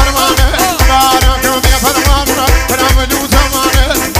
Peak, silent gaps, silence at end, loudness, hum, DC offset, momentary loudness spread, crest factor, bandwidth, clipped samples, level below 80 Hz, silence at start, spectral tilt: 0 dBFS; none; 0 s; -9 LUFS; none; under 0.1%; 2 LU; 10 dB; 16.5 kHz; 0.4%; -14 dBFS; 0 s; -3.5 dB/octave